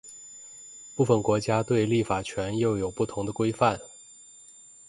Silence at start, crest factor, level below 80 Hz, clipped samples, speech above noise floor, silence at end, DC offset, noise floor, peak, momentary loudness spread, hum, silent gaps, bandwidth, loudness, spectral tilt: 0.05 s; 20 dB; -54 dBFS; under 0.1%; 26 dB; 0.9 s; under 0.1%; -51 dBFS; -8 dBFS; 23 LU; none; none; 11.5 kHz; -26 LUFS; -6 dB/octave